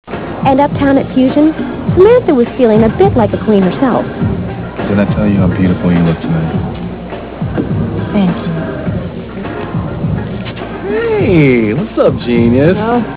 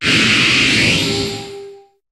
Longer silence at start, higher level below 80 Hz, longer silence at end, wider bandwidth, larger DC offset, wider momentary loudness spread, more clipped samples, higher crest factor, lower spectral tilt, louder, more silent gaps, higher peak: about the same, 0.05 s vs 0 s; first, -30 dBFS vs -42 dBFS; second, 0 s vs 0.35 s; second, 4 kHz vs 14.5 kHz; first, 0.4% vs under 0.1%; second, 12 LU vs 15 LU; first, 0.2% vs under 0.1%; about the same, 12 dB vs 14 dB; first, -12 dB/octave vs -3 dB/octave; about the same, -12 LUFS vs -12 LUFS; neither; about the same, 0 dBFS vs -2 dBFS